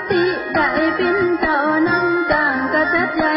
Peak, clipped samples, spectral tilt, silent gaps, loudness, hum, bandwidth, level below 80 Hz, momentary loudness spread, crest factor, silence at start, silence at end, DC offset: -4 dBFS; under 0.1%; -10 dB/octave; none; -17 LUFS; none; 5.6 kHz; -46 dBFS; 2 LU; 14 dB; 0 s; 0 s; under 0.1%